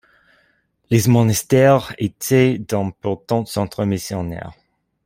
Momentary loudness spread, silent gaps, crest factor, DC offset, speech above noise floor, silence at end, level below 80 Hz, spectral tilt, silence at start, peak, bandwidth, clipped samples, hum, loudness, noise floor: 12 LU; none; 16 dB; under 0.1%; 45 dB; 0.55 s; -50 dBFS; -6 dB/octave; 0.9 s; -2 dBFS; 16.5 kHz; under 0.1%; none; -18 LUFS; -62 dBFS